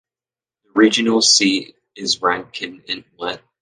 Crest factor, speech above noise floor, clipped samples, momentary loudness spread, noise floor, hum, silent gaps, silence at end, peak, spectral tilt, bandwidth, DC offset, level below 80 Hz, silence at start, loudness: 18 dB; over 72 dB; under 0.1%; 16 LU; under -90 dBFS; none; none; 0.25 s; -2 dBFS; -2 dB/octave; 10 kHz; under 0.1%; -62 dBFS; 0.75 s; -17 LUFS